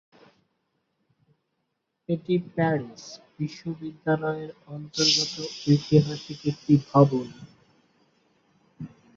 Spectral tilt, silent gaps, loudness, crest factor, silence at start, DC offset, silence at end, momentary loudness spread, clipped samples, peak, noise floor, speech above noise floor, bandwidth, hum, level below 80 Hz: -5.5 dB/octave; none; -25 LUFS; 24 dB; 2.1 s; under 0.1%; 0.3 s; 21 LU; under 0.1%; -4 dBFS; -78 dBFS; 53 dB; 7.6 kHz; none; -62 dBFS